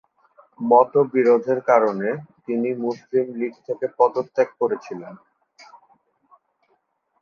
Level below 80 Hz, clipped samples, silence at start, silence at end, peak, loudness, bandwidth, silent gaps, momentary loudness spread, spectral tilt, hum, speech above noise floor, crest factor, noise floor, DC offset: -74 dBFS; under 0.1%; 0.6 s; 2.05 s; -2 dBFS; -21 LUFS; 6.8 kHz; none; 13 LU; -8 dB/octave; none; 48 dB; 20 dB; -68 dBFS; under 0.1%